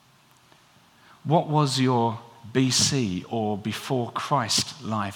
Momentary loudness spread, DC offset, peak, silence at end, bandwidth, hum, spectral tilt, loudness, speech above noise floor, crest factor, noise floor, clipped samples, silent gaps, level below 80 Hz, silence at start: 9 LU; under 0.1%; -8 dBFS; 0 s; 18.5 kHz; none; -4 dB/octave; -24 LUFS; 34 dB; 18 dB; -58 dBFS; under 0.1%; none; -64 dBFS; 1.25 s